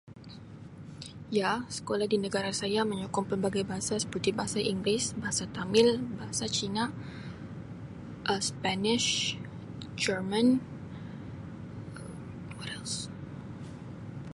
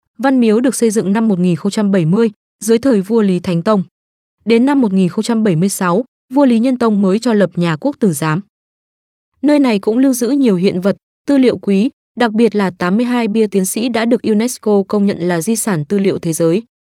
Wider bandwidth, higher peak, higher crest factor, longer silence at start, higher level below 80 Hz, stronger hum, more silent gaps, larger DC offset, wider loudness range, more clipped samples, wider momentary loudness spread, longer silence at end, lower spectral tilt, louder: second, 11.5 kHz vs 16 kHz; second, -10 dBFS vs 0 dBFS; first, 22 dB vs 14 dB; second, 0.05 s vs 0.2 s; about the same, -58 dBFS vs -60 dBFS; neither; second, none vs 2.36-2.59 s, 3.91-4.38 s, 6.08-6.29 s, 8.49-9.32 s, 11.03-11.25 s, 11.93-12.15 s; neither; about the same, 4 LU vs 2 LU; neither; first, 17 LU vs 5 LU; second, 0.05 s vs 0.25 s; second, -4 dB/octave vs -6 dB/octave; second, -30 LUFS vs -14 LUFS